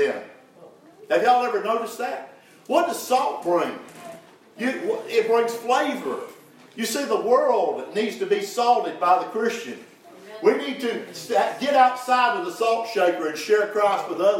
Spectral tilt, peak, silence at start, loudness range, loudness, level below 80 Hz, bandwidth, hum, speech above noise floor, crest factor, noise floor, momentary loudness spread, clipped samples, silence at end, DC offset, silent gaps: -3 dB/octave; -4 dBFS; 0 s; 4 LU; -23 LUFS; -86 dBFS; 16.5 kHz; none; 27 dB; 20 dB; -49 dBFS; 13 LU; under 0.1%; 0 s; under 0.1%; none